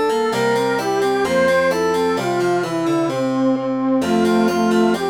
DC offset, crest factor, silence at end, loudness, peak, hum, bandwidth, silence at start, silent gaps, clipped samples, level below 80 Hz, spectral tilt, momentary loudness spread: under 0.1%; 12 dB; 0 s; -18 LUFS; -6 dBFS; none; 19.5 kHz; 0 s; none; under 0.1%; -56 dBFS; -5.5 dB/octave; 3 LU